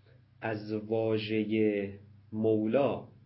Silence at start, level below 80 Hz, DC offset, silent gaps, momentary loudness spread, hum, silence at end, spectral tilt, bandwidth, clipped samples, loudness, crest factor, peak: 0.4 s; -66 dBFS; under 0.1%; none; 10 LU; none; 0.2 s; -10.5 dB/octave; 5.8 kHz; under 0.1%; -31 LUFS; 16 dB; -14 dBFS